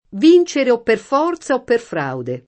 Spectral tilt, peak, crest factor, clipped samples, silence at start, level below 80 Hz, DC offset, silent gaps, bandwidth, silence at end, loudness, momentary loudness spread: -5.5 dB/octave; -2 dBFS; 14 dB; under 0.1%; 0.15 s; -58 dBFS; under 0.1%; none; 8.6 kHz; 0.1 s; -16 LUFS; 11 LU